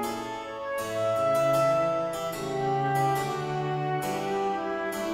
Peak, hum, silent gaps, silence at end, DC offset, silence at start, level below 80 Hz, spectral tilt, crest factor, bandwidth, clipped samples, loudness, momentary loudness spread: -14 dBFS; none; none; 0 s; under 0.1%; 0 s; -60 dBFS; -5.5 dB/octave; 14 dB; 16 kHz; under 0.1%; -28 LUFS; 9 LU